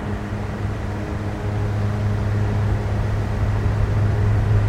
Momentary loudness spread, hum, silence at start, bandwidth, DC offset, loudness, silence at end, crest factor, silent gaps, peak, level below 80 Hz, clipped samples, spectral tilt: 7 LU; none; 0 s; 8.4 kHz; under 0.1%; -23 LUFS; 0 s; 12 dB; none; -8 dBFS; -28 dBFS; under 0.1%; -8 dB/octave